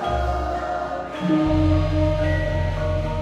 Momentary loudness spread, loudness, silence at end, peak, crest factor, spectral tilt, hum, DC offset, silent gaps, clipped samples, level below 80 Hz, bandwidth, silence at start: 7 LU; -22 LUFS; 0 s; -8 dBFS; 12 dB; -8 dB/octave; none; under 0.1%; none; under 0.1%; -30 dBFS; 8.4 kHz; 0 s